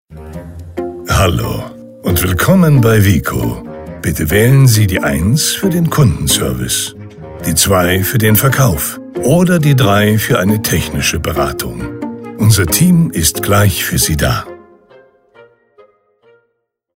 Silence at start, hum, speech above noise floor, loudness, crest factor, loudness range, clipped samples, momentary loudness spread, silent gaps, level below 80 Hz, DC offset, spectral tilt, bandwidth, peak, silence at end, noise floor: 0.1 s; none; 56 dB; -12 LUFS; 12 dB; 2 LU; under 0.1%; 14 LU; none; -30 dBFS; under 0.1%; -5 dB/octave; 16.5 kHz; 0 dBFS; 2.4 s; -67 dBFS